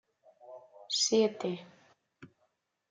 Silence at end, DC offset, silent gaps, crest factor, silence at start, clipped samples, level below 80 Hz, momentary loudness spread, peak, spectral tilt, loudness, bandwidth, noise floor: 0.65 s; under 0.1%; none; 18 dB; 0.45 s; under 0.1%; -84 dBFS; 26 LU; -16 dBFS; -3 dB/octave; -30 LUFS; 9.6 kHz; -77 dBFS